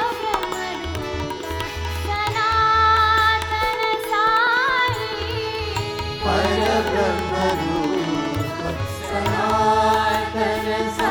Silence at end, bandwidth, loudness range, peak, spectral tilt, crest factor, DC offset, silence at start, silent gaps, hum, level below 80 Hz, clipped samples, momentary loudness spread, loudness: 0 s; over 20 kHz; 4 LU; -4 dBFS; -4.5 dB/octave; 18 dB; under 0.1%; 0 s; none; none; -38 dBFS; under 0.1%; 11 LU; -20 LUFS